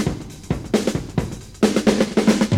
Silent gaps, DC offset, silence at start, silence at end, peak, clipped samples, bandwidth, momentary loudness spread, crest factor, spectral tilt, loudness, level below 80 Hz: none; under 0.1%; 0 s; 0 s; -2 dBFS; under 0.1%; 16 kHz; 11 LU; 16 dB; -5.5 dB/octave; -20 LUFS; -38 dBFS